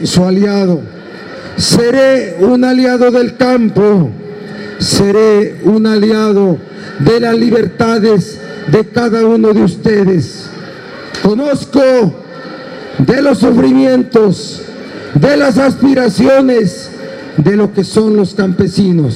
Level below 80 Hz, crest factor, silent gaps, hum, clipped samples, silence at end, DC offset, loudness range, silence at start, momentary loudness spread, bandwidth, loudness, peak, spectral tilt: -42 dBFS; 10 dB; none; none; under 0.1%; 0 s; under 0.1%; 2 LU; 0 s; 17 LU; 13 kHz; -10 LUFS; 0 dBFS; -6 dB/octave